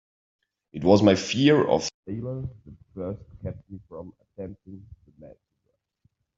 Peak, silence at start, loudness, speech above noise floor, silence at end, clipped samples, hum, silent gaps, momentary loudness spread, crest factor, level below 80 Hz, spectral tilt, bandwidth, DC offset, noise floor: -4 dBFS; 0.75 s; -23 LUFS; 51 dB; 1.1 s; under 0.1%; none; 1.94-2.03 s; 24 LU; 24 dB; -56 dBFS; -6 dB/octave; 7.8 kHz; under 0.1%; -76 dBFS